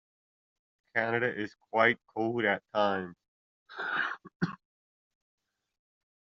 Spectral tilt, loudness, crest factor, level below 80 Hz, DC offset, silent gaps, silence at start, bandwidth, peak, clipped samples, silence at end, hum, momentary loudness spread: -3 dB/octave; -31 LUFS; 24 dB; -76 dBFS; under 0.1%; 3.28-3.66 s, 4.36-4.40 s; 0.95 s; 7.4 kHz; -10 dBFS; under 0.1%; 1.8 s; none; 12 LU